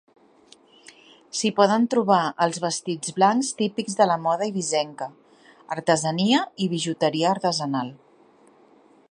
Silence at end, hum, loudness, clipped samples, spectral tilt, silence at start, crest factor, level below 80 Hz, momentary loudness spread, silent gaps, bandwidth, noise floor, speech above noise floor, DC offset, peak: 1.15 s; none; -23 LUFS; under 0.1%; -4 dB/octave; 1.35 s; 22 dB; -74 dBFS; 9 LU; none; 11.5 kHz; -55 dBFS; 33 dB; under 0.1%; -2 dBFS